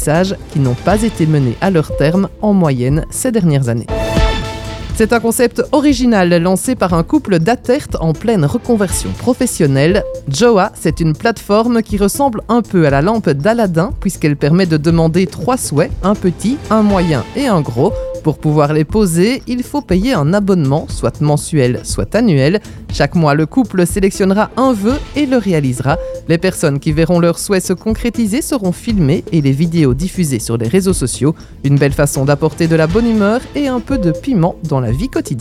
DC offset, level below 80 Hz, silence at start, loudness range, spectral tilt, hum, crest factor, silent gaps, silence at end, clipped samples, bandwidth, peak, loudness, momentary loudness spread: under 0.1%; -28 dBFS; 0 s; 1 LU; -6 dB/octave; none; 12 dB; none; 0 s; under 0.1%; 15.5 kHz; 0 dBFS; -14 LUFS; 5 LU